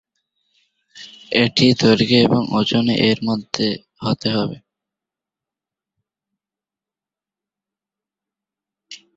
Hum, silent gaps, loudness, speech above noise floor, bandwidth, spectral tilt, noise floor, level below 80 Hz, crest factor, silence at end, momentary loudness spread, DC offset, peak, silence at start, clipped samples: none; none; -17 LUFS; 73 dB; 8 kHz; -5.5 dB/octave; -89 dBFS; -54 dBFS; 20 dB; 0.2 s; 11 LU; under 0.1%; -2 dBFS; 0.95 s; under 0.1%